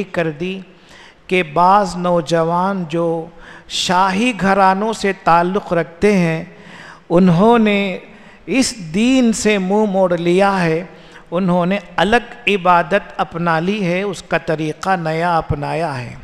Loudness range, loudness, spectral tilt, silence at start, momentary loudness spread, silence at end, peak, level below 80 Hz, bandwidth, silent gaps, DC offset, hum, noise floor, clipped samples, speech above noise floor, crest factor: 2 LU; -16 LUFS; -5.5 dB/octave; 0 s; 10 LU; 0 s; 0 dBFS; -44 dBFS; 13 kHz; none; 0.2%; none; -43 dBFS; under 0.1%; 27 dB; 16 dB